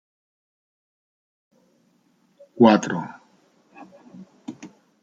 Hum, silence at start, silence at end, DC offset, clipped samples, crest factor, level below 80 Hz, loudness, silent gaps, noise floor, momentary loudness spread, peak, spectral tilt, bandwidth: none; 2.6 s; 0.35 s; under 0.1%; under 0.1%; 24 dB; -68 dBFS; -19 LUFS; none; -64 dBFS; 25 LU; -2 dBFS; -6 dB/octave; 7.8 kHz